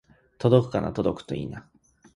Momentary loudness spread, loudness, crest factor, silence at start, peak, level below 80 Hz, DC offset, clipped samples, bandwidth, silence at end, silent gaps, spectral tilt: 15 LU; -25 LUFS; 22 dB; 0.4 s; -4 dBFS; -52 dBFS; under 0.1%; under 0.1%; 11 kHz; 0.55 s; none; -8.5 dB/octave